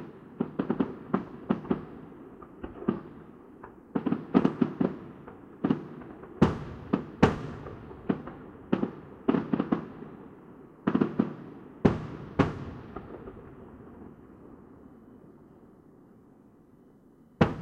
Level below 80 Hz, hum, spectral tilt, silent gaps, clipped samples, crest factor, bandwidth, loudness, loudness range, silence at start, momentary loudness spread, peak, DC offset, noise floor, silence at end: -52 dBFS; none; -8.5 dB/octave; none; under 0.1%; 26 dB; 8.2 kHz; -31 LUFS; 8 LU; 0 s; 22 LU; -6 dBFS; under 0.1%; -57 dBFS; 0 s